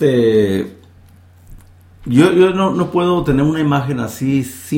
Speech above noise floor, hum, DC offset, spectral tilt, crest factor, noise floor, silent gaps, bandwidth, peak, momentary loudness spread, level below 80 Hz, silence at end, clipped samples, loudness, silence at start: 30 dB; none; under 0.1%; -7 dB/octave; 16 dB; -44 dBFS; none; 17 kHz; 0 dBFS; 9 LU; -40 dBFS; 0 s; under 0.1%; -15 LUFS; 0 s